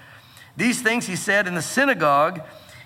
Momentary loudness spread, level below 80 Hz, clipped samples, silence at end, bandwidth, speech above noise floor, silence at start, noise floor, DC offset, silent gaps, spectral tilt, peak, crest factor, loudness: 16 LU; -68 dBFS; under 0.1%; 0 s; 17 kHz; 26 dB; 0.1 s; -47 dBFS; under 0.1%; none; -3.5 dB/octave; -6 dBFS; 16 dB; -20 LUFS